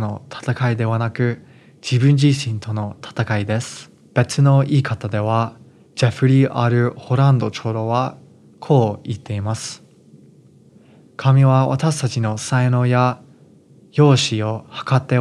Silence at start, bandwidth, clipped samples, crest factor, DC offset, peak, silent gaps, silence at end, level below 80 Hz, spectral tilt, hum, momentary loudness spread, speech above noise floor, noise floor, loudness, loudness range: 0 s; 11 kHz; under 0.1%; 18 dB; under 0.1%; 0 dBFS; none; 0 s; -64 dBFS; -6.5 dB/octave; none; 13 LU; 31 dB; -48 dBFS; -18 LUFS; 3 LU